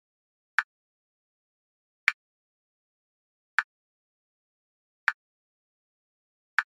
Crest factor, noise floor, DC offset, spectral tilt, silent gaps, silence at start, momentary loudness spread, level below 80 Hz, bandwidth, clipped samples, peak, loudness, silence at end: 34 dB; under -90 dBFS; under 0.1%; 7.5 dB/octave; 0.64-2.07 s, 2.14-3.58 s, 3.64-5.07 s, 5.14-6.58 s; 0.6 s; 17 LU; under -90 dBFS; 5.8 kHz; under 0.1%; -2 dBFS; -30 LUFS; 0.15 s